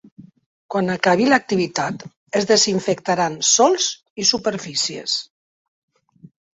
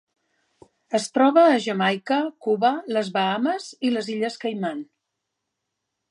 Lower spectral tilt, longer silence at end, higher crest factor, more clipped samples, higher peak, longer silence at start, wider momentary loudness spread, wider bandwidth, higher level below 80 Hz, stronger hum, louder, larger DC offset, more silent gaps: second, -2.5 dB/octave vs -5 dB/octave; about the same, 1.35 s vs 1.25 s; about the same, 18 dB vs 18 dB; neither; first, -2 dBFS vs -6 dBFS; second, 0.2 s vs 0.9 s; about the same, 10 LU vs 10 LU; second, 8.4 kHz vs 11.5 kHz; first, -62 dBFS vs -80 dBFS; neither; first, -18 LUFS vs -22 LUFS; neither; first, 0.46-0.69 s, 2.17-2.26 s, 4.10-4.16 s vs none